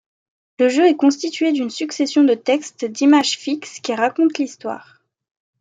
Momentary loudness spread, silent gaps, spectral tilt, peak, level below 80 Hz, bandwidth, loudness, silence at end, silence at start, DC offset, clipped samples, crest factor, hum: 11 LU; none; -3 dB/octave; -4 dBFS; -74 dBFS; 9.2 kHz; -18 LUFS; 0.8 s; 0.6 s; under 0.1%; under 0.1%; 16 dB; none